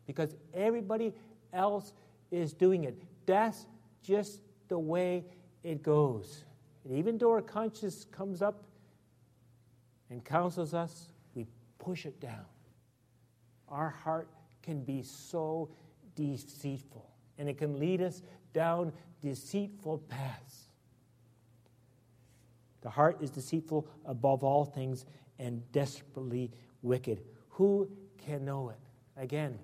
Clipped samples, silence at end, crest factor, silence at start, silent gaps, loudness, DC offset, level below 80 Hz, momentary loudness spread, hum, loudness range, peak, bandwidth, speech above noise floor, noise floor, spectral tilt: under 0.1%; 0 s; 24 dB; 0.1 s; none; -35 LUFS; under 0.1%; -76 dBFS; 20 LU; none; 9 LU; -12 dBFS; 15.5 kHz; 34 dB; -68 dBFS; -7 dB/octave